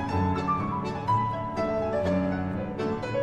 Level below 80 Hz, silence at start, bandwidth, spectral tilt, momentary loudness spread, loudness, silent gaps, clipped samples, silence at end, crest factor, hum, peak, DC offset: -48 dBFS; 0 s; 9.2 kHz; -8 dB/octave; 4 LU; -28 LUFS; none; under 0.1%; 0 s; 12 dB; none; -16 dBFS; under 0.1%